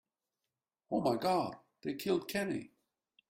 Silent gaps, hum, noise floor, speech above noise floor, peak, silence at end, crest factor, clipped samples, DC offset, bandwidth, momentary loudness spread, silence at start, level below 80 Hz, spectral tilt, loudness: none; none; under -90 dBFS; over 56 dB; -20 dBFS; 0.6 s; 18 dB; under 0.1%; under 0.1%; 16 kHz; 10 LU; 0.9 s; -74 dBFS; -5.5 dB/octave; -36 LUFS